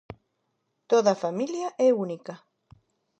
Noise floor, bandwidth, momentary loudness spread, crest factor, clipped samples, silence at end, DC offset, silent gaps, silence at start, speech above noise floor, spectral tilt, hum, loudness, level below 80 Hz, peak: -77 dBFS; 8.4 kHz; 14 LU; 20 dB; under 0.1%; 0.85 s; under 0.1%; none; 0.1 s; 52 dB; -5.5 dB/octave; none; -25 LUFS; -68 dBFS; -8 dBFS